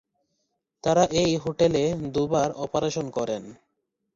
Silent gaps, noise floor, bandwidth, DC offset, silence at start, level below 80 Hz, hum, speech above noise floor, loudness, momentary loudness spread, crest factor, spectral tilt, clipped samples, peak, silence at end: none; -78 dBFS; 7.8 kHz; under 0.1%; 0.85 s; -54 dBFS; none; 54 dB; -25 LUFS; 8 LU; 18 dB; -5.5 dB/octave; under 0.1%; -8 dBFS; 0.65 s